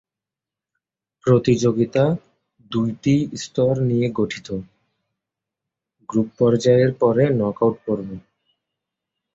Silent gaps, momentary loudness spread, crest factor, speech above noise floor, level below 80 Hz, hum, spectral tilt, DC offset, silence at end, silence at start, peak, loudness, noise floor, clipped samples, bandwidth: none; 12 LU; 18 dB; 69 dB; -54 dBFS; none; -7 dB/octave; under 0.1%; 1.15 s; 1.25 s; -4 dBFS; -20 LUFS; -88 dBFS; under 0.1%; 7.8 kHz